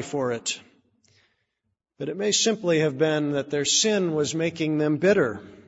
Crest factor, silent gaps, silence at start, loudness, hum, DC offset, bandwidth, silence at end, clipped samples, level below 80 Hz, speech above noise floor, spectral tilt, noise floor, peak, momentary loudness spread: 18 dB; none; 0 s; -23 LUFS; none; under 0.1%; 8.2 kHz; 0.05 s; under 0.1%; -66 dBFS; 55 dB; -3.5 dB/octave; -79 dBFS; -8 dBFS; 9 LU